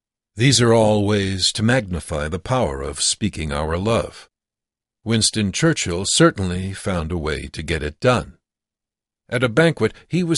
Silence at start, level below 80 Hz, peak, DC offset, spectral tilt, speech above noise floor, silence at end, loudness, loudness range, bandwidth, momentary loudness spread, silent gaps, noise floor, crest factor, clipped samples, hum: 0.35 s; -38 dBFS; -2 dBFS; under 0.1%; -4.5 dB/octave; 69 dB; 0 s; -19 LUFS; 4 LU; 11.5 kHz; 10 LU; none; -88 dBFS; 18 dB; under 0.1%; none